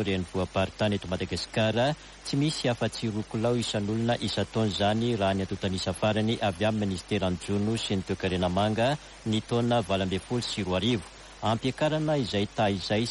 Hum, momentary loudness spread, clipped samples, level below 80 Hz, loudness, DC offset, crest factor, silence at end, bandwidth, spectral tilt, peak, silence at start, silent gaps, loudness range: none; 5 LU; under 0.1%; -52 dBFS; -28 LUFS; under 0.1%; 14 dB; 0 s; 11.5 kHz; -5.5 dB/octave; -14 dBFS; 0 s; none; 1 LU